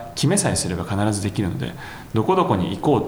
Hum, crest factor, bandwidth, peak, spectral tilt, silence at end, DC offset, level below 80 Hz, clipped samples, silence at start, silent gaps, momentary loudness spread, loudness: none; 16 dB; over 20 kHz; -4 dBFS; -5 dB/octave; 0 s; under 0.1%; -44 dBFS; under 0.1%; 0 s; none; 9 LU; -21 LUFS